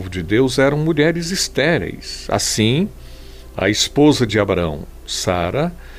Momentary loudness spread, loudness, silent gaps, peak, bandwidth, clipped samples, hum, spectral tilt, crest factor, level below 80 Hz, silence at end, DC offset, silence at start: 11 LU; -17 LUFS; none; -2 dBFS; 16 kHz; under 0.1%; none; -4.5 dB/octave; 16 dB; -36 dBFS; 0 s; 0.1%; 0 s